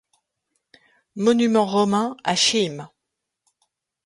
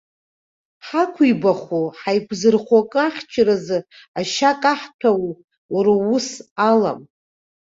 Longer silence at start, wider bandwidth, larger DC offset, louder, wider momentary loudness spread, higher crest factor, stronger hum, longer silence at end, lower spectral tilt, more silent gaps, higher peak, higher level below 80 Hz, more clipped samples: first, 1.15 s vs 0.85 s; first, 11.5 kHz vs 7.8 kHz; neither; about the same, -20 LUFS vs -19 LUFS; about the same, 10 LU vs 9 LU; about the same, 20 dB vs 18 dB; neither; first, 1.2 s vs 0.75 s; second, -3.5 dB/octave vs -5 dB/octave; second, none vs 4.08-4.14 s, 4.94-4.99 s, 5.44-5.48 s, 5.58-5.69 s, 6.51-6.56 s; about the same, -4 dBFS vs -2 dBFS; second, -68 dBFS vs -62 dBFS; neither